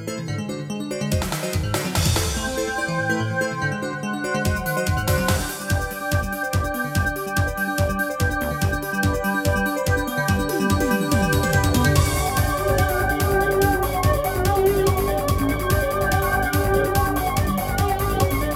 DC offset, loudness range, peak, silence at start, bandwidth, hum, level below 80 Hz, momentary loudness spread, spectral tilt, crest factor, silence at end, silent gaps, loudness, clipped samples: under 0.1%; 3 LU; -4 dBFS; 0 s; 17 kHz; none; -30 dBFS; 5 LU; -5 dB/octave; 16 dB; 0 s; none; -22 LUFS; under 0.1%